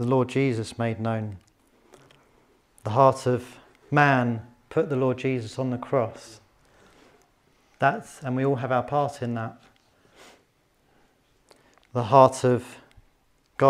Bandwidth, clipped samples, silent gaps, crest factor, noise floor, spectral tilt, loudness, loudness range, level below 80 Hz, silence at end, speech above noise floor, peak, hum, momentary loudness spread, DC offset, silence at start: 13 kHz; under 0.1%; none; 24 dB; -65 dBFS; -7 dB/octave; -24 LUFS; 6 LU; -66 dBFS; 0 s; 42 dB; -2 dBFS; none; 15 LU; under 0.1%; 0 s